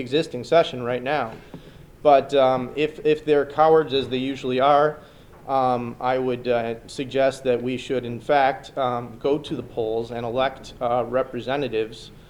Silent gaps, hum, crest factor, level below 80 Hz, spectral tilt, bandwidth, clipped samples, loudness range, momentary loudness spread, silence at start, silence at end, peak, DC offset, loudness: none; none; 18 dB; -52 dBFS; -6 dB/octave; 12.5 kHz; under 0.1%; 4 LU; 10 LU; 0 s; 0.1 s; -4 dBFS; under 0.1%; -23 LUFS